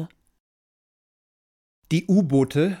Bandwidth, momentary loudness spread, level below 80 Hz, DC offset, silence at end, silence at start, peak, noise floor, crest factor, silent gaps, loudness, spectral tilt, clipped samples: 14 kHz; 8 LU; -60 dBFS; under 0.1%; 0 s; 0 s; -8 dBFS; under -90 dBFS; 16 dB; 0.40-1.82 s; -21 LUFS; -7.5 dB/octave; under 0.1%